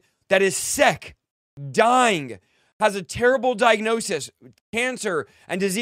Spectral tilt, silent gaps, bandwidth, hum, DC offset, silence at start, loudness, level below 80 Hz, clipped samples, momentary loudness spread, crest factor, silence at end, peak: -3 dB/octave; 1.31-1.57 s, 2.73-2.80 s, 4.61-4.73 s; 16 kHz; none; under 0.1%; 0.3 s; -21 LUFS; -56 dBFS; under 0.1%; 11 LU; 20 dB; 0 s; -2 dBFS